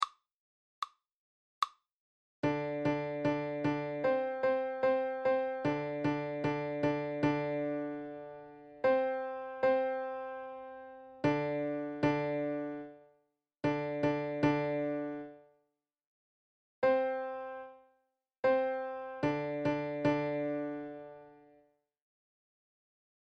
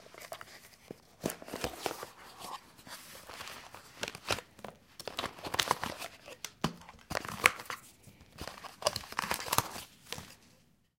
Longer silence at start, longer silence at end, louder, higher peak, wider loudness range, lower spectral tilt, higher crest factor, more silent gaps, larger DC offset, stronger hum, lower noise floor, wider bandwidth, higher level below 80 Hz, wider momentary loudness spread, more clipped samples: about the same, 0 s vs 0 s; first, 1.9 s vs 0.5 s; first, -34 LUFS vs -37 LUFS; second, -16 dBFS vs -2 dBFS; second, 4 LU vs 9 LU; first, -7.5 dB/octave vs -2 dB/octave; second, 20 dB vs 38 dB; first, 0.32-0.82 s, 1.12-1.62 s, 1.92-2.43 s, 16.07-16.82 s, 18.39-18.43 s vs none; neither; neither; first, -81 dBFS vs -67 dBFS; second, 8.4 kHz vs 17 kHz; second, -68 dBFS vs -62 dBFS; second, 14 LU vs 20 LU; neither